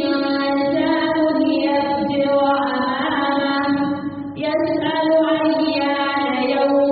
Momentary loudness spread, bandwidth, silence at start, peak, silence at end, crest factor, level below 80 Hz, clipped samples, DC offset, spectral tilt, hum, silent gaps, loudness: 4 LU; 5 kHz; 0 s; -6 dBFS; 0 s; 12 dB; -56 dBFS; under 0.1%; under 0.1%; -3 dB/octave; none; none; -19 LUFS